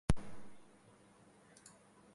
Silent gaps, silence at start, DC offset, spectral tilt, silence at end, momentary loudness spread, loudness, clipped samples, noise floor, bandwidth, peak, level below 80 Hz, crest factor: none; 0.1 s; under 0.1%; -6 dB/octave; 1.5 s; 23 LU; -42 LUFS; under 0.1%; -65 dBFS; 11.5 kHz; -16 dBFS; -50 dBFS; 24 dB